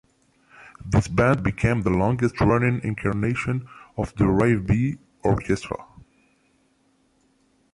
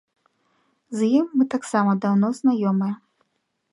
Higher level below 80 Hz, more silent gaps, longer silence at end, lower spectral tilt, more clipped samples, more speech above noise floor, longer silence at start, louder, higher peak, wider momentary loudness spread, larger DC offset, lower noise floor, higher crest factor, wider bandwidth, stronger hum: first, -40 dBFS vs -72 dBFS; neither; first, 1.9 s vs 0.8 s; about the same, -8 dB/octave vs -7 dB/octave; neither; second, 43 dB vs 53 dB; second, 0.6 s vs 0.9 s; about the same, -23 LUFS vs -21 LUFS; about the same, -6 dBFS vs -6 dBFS; first, 11 LU vs 8 LU; neither; second, -64 dBFS vs -74 dBFS; about the same, 16 dB vs 16 dB; about the same, 11.5 kHz vs 11.5 kHz; neither